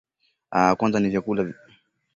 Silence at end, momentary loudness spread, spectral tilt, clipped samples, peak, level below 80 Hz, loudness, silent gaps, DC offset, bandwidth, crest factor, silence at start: 0.65 s; 8 LU; -6.5 dB/octave; under 0.1%; -4 dBFS; -56 dBFS; -23 LUFS; none; under 0.1%; 7.2 kHz; 20 dB; 0.5 s